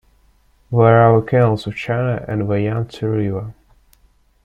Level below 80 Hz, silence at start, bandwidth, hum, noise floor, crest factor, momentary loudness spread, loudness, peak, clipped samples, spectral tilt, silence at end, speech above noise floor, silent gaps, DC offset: -48 dBFS; 0.7 s; 7 kHz; none; -56 dBFS; 16 dB; 11 LU; -17 LUFS; -2 dBFS; under 0.1%; -9 dB/octave; 0.9 s; 40 dB; none; under 0.1%